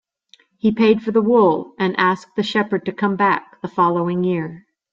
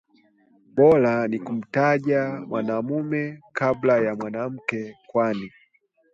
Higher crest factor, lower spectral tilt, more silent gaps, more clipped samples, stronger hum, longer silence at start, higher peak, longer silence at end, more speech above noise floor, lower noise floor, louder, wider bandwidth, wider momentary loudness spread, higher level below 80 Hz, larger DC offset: about the same, 16 dB vs 18 dB; about the same, -7.5 dB/octave vs -8 dB/octave; neither; neither; neither; about the same, 0.65 s vs 0.75 s; about the same, -2 dBFS vs -4 dBFS; second, 0.35 s vs 0.65 s; second, 37 dB vs 42 dB; second, -55 dBFS vs -64 dBFS; first, -18 LUFS vs -23 LUFS; about the same, 7.6 kHz vs 7.6 kHz; second, 8 LU vs 11 LU; about the same, -60 dBFS vs -64 dBFS; neither